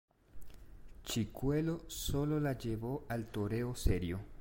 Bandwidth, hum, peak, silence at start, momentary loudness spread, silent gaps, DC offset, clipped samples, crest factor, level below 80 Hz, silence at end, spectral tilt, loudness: 16.5 kHz; none; -18 dBFS; 0.35 s; 5 LU; none; under 0.1%; under 0.1%; 20 dB; -46 dBFS; 0 s; -6 dB/octave; -37 LUFS